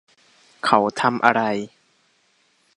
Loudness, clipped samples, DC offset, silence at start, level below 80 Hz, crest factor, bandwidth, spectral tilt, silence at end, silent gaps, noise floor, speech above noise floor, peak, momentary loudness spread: -20 LUFS; under 0.1%; under 0.1%; 0.65 s; -68 dBFS; 22 dB; 11 kHz; -5 dB/octave; 1.1 s; none; -63 dBFS; 44 dB; 0 dBFS; 10 LU